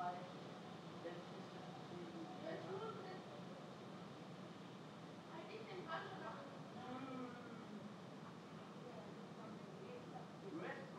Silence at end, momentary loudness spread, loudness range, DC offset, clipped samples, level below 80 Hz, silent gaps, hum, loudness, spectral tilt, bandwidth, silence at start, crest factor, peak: 0 s; 6 LU; 2 LU; under 0.1%; under 0.1%; under -90 dBFS; none; none; -53 LUFS; -6 dB/octave; 12.5 kHz; 0 s; 18 dB; -34 dBFS